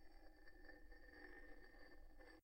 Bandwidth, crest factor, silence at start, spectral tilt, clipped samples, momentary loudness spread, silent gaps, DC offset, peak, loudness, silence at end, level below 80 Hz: 16 kHz; 14 dB; 0 s; -5 dB/octave; under 0.1%; 6 LU; none; under 0.1%; -46 dBFS; -65 LUFS; 0 s; -66 dBFS